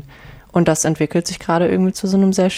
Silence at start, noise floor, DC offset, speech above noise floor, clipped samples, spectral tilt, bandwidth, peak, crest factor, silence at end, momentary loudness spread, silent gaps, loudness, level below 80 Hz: 0.05 s; -40 dBFS; under 0.1%; 24 dB; under 0.1%; -5.5 dB/octave; 15.5 kHz; -4 dBFS; 14 dB; 0 s; 5 LU; none; -17 LUFS; -46 dBFS